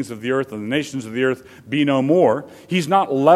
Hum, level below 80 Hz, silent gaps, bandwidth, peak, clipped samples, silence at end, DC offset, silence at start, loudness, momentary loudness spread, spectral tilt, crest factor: none; -64 dBFS; none; 14 kHz; 0 dBFS; under 0.1%; 0 s; under 0.1%; 0 s; -20 LUFS; 10 LU; -6 dB/octave; 18 dB